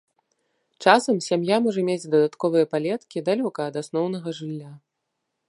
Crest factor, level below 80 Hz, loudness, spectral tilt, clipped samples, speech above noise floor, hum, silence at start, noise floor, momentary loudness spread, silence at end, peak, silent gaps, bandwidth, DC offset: 22 dB; -78 dBFS; -23 LUFS; -5.5 dB/octave; under 0.1%; 57 dB; none; 0.8 s; -79 dBFS; 12 LU; 0.7 s; -2 dBFS; none; 11.5 kHz; under 0.1%